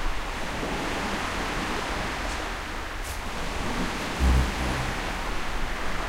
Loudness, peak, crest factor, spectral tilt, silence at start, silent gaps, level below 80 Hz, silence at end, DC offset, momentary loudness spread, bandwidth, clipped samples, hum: -29 LUFS; -12 dBFS; 16 dB; -4.5 dB/octave; 0 s; none; -32 dBFS; 0 s; under 0.1%; 8 LU; 16 kHz; under 0.1%; none